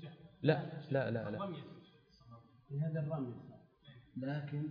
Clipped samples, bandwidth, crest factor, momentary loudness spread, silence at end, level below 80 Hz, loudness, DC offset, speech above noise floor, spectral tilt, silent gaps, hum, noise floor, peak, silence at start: under 0.1%; 5.2 kHz; 24 dB; 25 LU; 0 s; -76 dBFS; -39 LUFS; under 0.1%; 25 dB; -7 dB/octave; none; none; -63 dBFS; -16 dBFS; 0 s